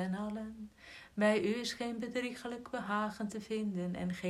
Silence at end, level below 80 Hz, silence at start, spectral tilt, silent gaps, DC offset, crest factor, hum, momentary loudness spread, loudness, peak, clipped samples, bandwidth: 0 s; -66 dBFS; 0 s; -5.5 dB/octave; none; under 0.1%; 20 dB; none; 15 LU; -37 LUFS; -18 dBFS; under 0.1%; 13.5 kHz